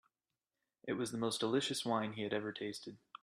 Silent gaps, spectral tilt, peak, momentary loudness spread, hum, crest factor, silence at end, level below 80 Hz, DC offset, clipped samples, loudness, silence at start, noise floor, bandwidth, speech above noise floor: none; -4 dB/octave; -22 dBFS; 13 LU; none; 18 dB; 0.25 s; -80 dBFS; under 0.1%; under 0.1%; -38 LUFS; 0.85 s; under -90 dBFS; 14.5 kHz; over 52 dB